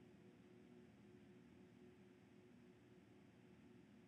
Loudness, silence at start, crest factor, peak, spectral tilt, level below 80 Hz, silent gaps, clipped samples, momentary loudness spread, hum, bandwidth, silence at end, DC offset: -67 LUFS; 0 s; 14 dB; -54 dBFS; -6.5 dB/octave; -88 dBFS; none; under 0.1%; 2 LU; none; 8.4 kHz; 0 s; under 0.1%